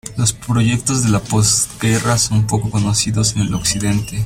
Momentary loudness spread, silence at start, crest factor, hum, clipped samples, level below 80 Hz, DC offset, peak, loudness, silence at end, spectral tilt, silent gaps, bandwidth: 4 LU; 0.05 s; 14 dB; none; under 0.1%; -38 dBFS; under 0.1%; -2 dBFS; -16 LUFS; 0 s; -4 dB/octave; none; 16 kHz